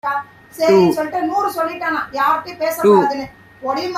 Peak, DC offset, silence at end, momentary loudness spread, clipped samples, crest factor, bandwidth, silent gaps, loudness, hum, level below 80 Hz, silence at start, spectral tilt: -2 dBFS; under 0.1%; 0 s; 13 LU; under 0.1%; 16 dB; 15.5 kHz; none; -17 LUFS; none; -58 dBFS; 0.05 s; -5.5 dB/octave